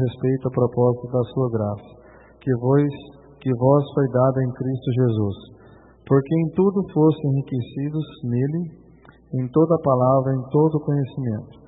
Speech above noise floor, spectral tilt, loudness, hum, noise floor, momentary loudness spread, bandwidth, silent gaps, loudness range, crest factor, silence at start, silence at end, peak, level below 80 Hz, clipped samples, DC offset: 29 dB; -13.5 dB/octave; -21 LUFS; none; -49 dBFS; 10 LU; 4 kHz; none; 2 LU; 18 dB; 0 s; 0.2 s; -4 dBFS; -56 dBFS; under 0.1%; under 0.1%